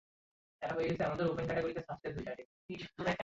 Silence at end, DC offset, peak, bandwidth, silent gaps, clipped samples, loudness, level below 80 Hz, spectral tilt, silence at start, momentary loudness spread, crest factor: 0 s; under 0.1%; -22 dBFS; 7.6 kHz; 2.45-2.69 s; under 0.1%; -38 LUFS; -62 dBFS; -5 dB/octave; 0.6 s; 12 LU; 16 dB